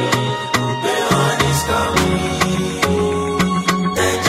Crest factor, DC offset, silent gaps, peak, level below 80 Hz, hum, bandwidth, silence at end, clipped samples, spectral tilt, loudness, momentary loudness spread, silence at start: 16 dB; under 0.1%; none; 0 dBFS; -36 dBFS; none; 16.5 kHz; 0 s; under 0.1%; -4.5 dB/octave; -17 LUFS; 3 LU; 0 s